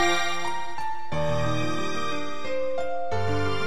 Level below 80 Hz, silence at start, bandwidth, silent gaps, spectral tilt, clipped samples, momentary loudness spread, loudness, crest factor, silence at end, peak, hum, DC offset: -50 dBFS; 0 s; 15.5 kHz; none; -4.5 dB/octave; under 0.1%; 6 LU; -29 LUFS; 18 dB; 0 s; -10 dBFS; none; 5%